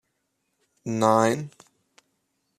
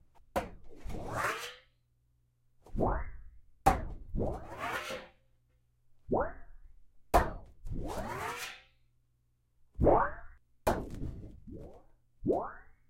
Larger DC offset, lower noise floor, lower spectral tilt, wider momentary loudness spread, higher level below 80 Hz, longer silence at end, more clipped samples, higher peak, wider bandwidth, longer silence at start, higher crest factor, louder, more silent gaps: neither; about the same, -76 dBFS vs -73 dBFS; about the same, -5.5 dB/octave vs -5.5 dB/octave; about the same, 19 LU vs 20 LU; second, -70 dBFS vs -44 dBFS; first, 1.1 s vs 0.15 s; neither; first, -4 dBFS vs -8 dBFS; second, 14 kHz vs 16.5 kHz; first, 0.85 s vs 0.35 s; about the same, 24 dB vs 28 dB; first, -23 LUFS vs -35 LUFS; neither